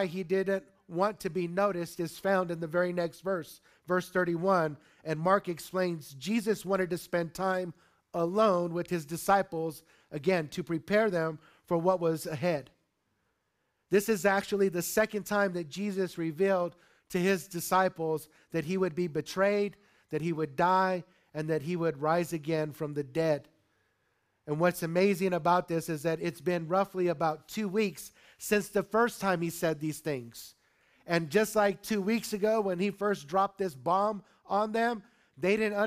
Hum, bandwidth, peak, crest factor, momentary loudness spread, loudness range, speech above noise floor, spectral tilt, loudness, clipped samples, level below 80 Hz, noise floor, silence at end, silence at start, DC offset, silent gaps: none; 15.5 kHz; -10 dBFS; 20 dB; 9 LU; 2 LU; 48 dB; -5.5 dB/octave; -31 LUFS; under 0.1%; -68 dBFS; -78 dBFS; 0 s; 0 s; under 0.1%; none